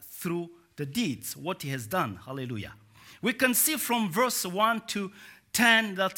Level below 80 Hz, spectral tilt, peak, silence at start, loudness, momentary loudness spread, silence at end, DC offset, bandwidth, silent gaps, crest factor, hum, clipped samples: -68 dBFS; -3 dB/octave; -6 dBFS; 0 s; -27 LUFS; 15 LU; 0.05 s; under 0.1%; 17.5 kHz; none; 22 dB; none; under 0.1%